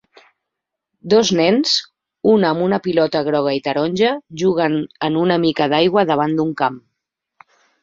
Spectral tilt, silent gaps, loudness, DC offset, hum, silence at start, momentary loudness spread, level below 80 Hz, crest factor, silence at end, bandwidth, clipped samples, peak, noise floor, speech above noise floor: -5 dB/octave; none; -17 LUFS; under 0.1%; none; 1.05 s; 6 LU; -58 dBFS; 16 dB; 1.05 s; 7.8 kHz; under 0.1%; -2 dBFS; -81 dBFS; 64 dB